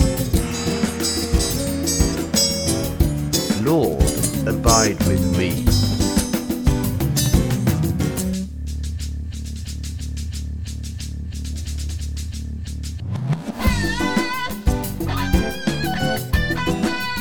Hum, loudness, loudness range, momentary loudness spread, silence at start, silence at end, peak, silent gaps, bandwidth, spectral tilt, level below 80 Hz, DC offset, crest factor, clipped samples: none; -21 LUFS; 10 LU; 12 LU; 0 s; 0 s; 0 dBFS; none; over 20 kHz; -4.5 dB/octave; -28 dBFS; under 0.1%; 20 dB; under 0.1%